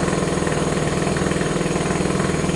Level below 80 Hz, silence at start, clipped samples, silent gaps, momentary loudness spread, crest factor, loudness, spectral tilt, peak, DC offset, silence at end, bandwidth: -38 dBFS; 0 s; under 0.1%; none; 1 LU; 14 dB; -21 LUFS; -5 dB/octave; -6 dBFS; under 0.1%; 0 s; 11.5 kHz